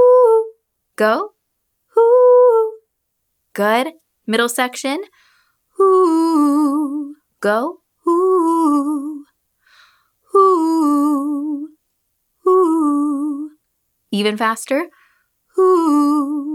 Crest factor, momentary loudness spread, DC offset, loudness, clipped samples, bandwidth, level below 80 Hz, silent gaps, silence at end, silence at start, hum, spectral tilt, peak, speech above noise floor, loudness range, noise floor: 14 dB; 16 LU; under 0.1%; -16 LUFS; under 0.1%; 16.5 kHz; -80 dBFS; none; 0 s; 0 s; none; -4.5 dB/octave; -2 dBFS; 55 dB; 4 LU; -72 dBFS